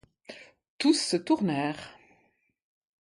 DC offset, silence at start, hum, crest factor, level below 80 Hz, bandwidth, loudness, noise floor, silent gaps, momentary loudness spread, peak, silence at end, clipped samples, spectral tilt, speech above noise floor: under 0.1%; 0.3 s; none; 20 dB; -72 dBFS; 11.5 kHz; -27 LUFS; -70 dBFS; 0.69-0.79 s; 23 LU; -12 dBFS; 1.1 s; under 0.1%; -4 dB/octave; 44 dB